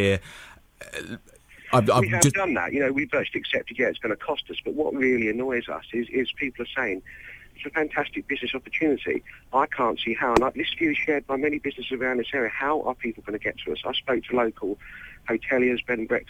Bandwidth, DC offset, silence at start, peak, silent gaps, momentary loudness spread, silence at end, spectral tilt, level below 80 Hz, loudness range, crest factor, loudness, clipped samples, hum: 17 kHz; under 0.1%; 0 s; -6 dBFS; none; 13 LU; 0.05 s; -4 dB/octave; -52 dBFS; 4 LU; 20 dB; -25 LUFS; under 0.1%; none